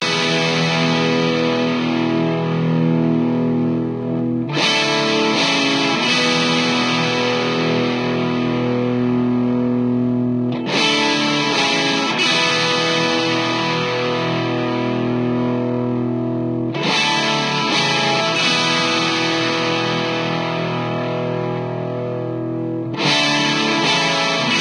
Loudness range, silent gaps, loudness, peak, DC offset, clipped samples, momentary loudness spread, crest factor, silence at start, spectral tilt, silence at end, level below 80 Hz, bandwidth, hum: 4 LU; none; -17 LUFS; -2 dBFS; under 0.1%; under 0.1%; 6 LU; 16 dB; 0 s; -4.5 dB/octave; 0 s; -58 dBFS; 11.5 kHz; none